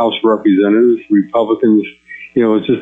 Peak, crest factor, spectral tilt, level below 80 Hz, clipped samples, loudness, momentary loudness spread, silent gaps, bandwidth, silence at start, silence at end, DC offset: -2 dBFS; 10 dB; -9 dB/octave; -58 dBFS; under 0.1%; -13 LUFS; 7 LU; none; 3.8 kHz; 0 s; 0 s; under 0.1%